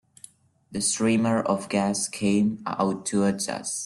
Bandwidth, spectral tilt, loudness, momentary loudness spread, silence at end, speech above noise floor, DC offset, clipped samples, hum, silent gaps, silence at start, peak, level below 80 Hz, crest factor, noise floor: 12.5 kHz; -4.5 dB/octave; -25 LUFS; 5 LU; 0 s; 27 dB; under 0.1%; under 0.1%; none; none; 0.7 s; -10 dBFS; -62 dBFS; 16 dB; -52 dBFS